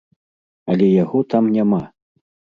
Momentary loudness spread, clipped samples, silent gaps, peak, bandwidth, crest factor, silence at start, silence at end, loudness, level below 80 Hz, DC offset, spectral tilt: 13 LU; under 0.1%; none; -4 dBFS; 5.2 kHz; 16 dB; 0.65 s; 0.65 s; -17 LUFS; -58 dBFS; under 0.1%; -10 dB/octave